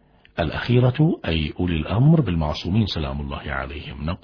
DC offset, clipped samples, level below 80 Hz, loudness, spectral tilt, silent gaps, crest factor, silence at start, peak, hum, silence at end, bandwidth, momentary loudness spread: under 0.1%; under 0.1%; -36 dBFS; -22 LUFS; -8.5 dB/octave; none; 16 dB; 0.35 s; -4 dBFS; none; 0.05 s; 5.4 kHz; 12 LU